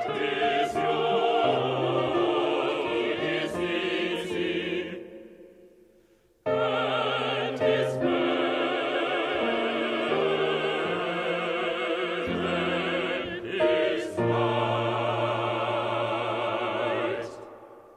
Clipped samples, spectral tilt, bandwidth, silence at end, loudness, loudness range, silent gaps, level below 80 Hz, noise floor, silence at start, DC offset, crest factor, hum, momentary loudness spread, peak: under 0.1%; -5.5 dB/octave; 12 kHz; 0 s; -27 LUFS; 4 LU; none; -62 dBFS; -61 dBFS; 0 s; under 0.1%; 16 dB; none; 5 LU; -12 dBFS